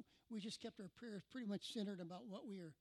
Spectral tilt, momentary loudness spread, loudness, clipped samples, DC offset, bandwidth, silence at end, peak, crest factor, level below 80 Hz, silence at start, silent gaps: -5 dB/octave; 7 LU; -51 LUFS; under 0.1%; under 0.1%; 13 kHz; 0.05 s; -34 dBFS; 16 dB; -88 dBFS; 0 s; none